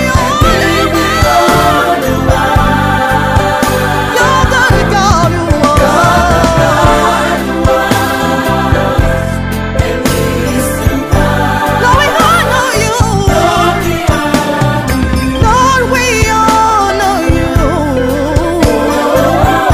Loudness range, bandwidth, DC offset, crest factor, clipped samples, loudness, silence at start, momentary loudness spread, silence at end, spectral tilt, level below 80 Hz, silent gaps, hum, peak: 3 LU; 16.5 kHz; under 0.1%; 10 dB; 0.3%; -10 LUFS; 0 s; 4 LU; 0 s; -5 dB/octave; -20 dBFS; none; none; 0 dBFS